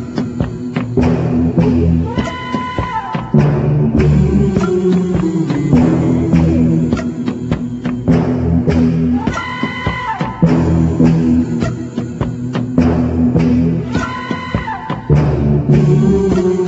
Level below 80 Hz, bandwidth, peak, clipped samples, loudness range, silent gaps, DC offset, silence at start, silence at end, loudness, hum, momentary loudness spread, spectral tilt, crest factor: -28 dBFS; 8 kHz; 0 dBFS; under 0.1%; 3 LU; none; under 0.1%; 0 s; 0 s; -14 LUFS; none; 9 LU; -8.5 dB/octave; 12 dB